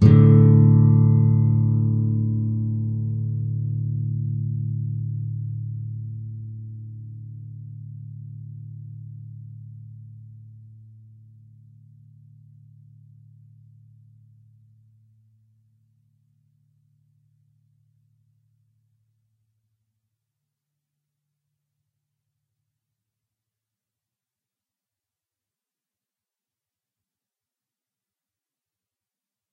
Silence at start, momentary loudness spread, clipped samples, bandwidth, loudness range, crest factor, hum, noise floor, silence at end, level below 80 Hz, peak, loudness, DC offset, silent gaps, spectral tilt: 0 s; 26 LU; under 0.1%; 2.3 kHz; 25 LU; 24 dB; none; under -90 dBFS; 19.45 s; -52 dBFS; -2 dBFS; -20 LUFS; under 0.1%; none; -12 dB/octave